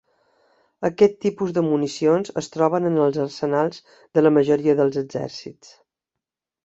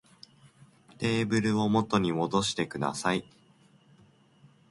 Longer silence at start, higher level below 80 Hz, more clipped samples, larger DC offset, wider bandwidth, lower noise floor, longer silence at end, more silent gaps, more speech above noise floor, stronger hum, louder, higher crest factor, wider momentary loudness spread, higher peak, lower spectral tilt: second, 0.8 s vs 1 s; about the same, -64 dBFS vs -62 dBFS; neither; neither; second, 8 kHz vs 11.5 kHz; first, -86 dBFS vs -61 dBFS; second, 1.15 s vs 1.5 s; neither; first, 65 dB vs 33 dB; neither; first, -21 LUFS vs -28 LUFS; about the same, 18 dB vs 20 dB; first, 11 LU vs 5 LU; first, -2 dBFS vs -10 dBFS; first, -6.5 dB/octave vs -5 dB/octave